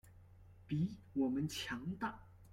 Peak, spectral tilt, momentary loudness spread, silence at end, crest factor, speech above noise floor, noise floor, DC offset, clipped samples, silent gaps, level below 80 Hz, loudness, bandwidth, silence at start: -26 dBFS; -5.5 dB/octave; 7 LU; 0 s; 16 dB; 21 dB; -61 dBFS; under 0.1%; under 0.1%; none; -66 dBFS; -41 LUFS; 16.5 kHz; 0.05 s